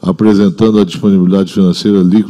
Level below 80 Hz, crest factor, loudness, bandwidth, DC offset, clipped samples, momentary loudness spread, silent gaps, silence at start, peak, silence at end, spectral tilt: -44 dBFS; 8 dB; -10 LUFS; 10.5 kHz; under 0.1%; under 0.1%; 2 LU; none; 0.05 s; 0 dBFS; 0 s; -8 dB/octave